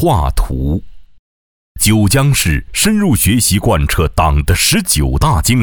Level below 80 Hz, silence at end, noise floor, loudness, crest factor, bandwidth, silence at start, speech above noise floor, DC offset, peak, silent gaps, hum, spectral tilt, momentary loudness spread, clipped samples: -20 dBFS; 0 s; under -90 dBFS; -13 LUFS; 12 dB; over 20 kHz; 0 s; over 78 dB; under 0.1%; 0 dBFS; 1.19-1.75 s; none; -4.5 dB/octave; 7 LU; under 0.1%